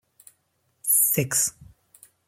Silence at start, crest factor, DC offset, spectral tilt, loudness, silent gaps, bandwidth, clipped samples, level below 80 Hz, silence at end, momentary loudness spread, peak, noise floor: 0.85 s; 20 dB; under 0.1%; -2.5 dB/octave; -21 LUFS; none; 16.5 kHz; under 0.1%; -62 dBFS; 0.65 s; 9 LU; -8 dBFS; -71 dBFS